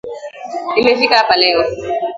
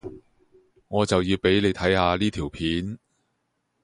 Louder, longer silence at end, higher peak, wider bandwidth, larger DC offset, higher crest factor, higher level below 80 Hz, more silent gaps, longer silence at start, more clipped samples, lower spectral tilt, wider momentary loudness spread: first, -13 LUFS vs -23 LUFS; second, 0 s vs 0.85 s; first, 0 dBFS vs -6 dBFS; second, 7.8 kHz vs 11.5 kHz; neither; second, 14 dB vs 20 dB; about the same, -48 dBFS vs -44 dBFS; neither; about the same, 0.05 s vs 0.05 s; neither; second, -3.5 dB/octave vs -5.5 dB/octave; first, 16 LU vs 12 LU